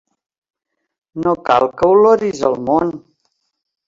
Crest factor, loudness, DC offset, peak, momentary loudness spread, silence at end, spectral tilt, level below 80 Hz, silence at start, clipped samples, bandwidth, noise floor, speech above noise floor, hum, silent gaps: 16 dB; -15 LUFS; under 0.1%; 0 dBFS; 12 LU; 0.9 s; -6.5 dB/octave; -52 dBFS; 1.15 s; under 0.1%; 7.6 kHz; -73 dBFS; 59 dB; none; none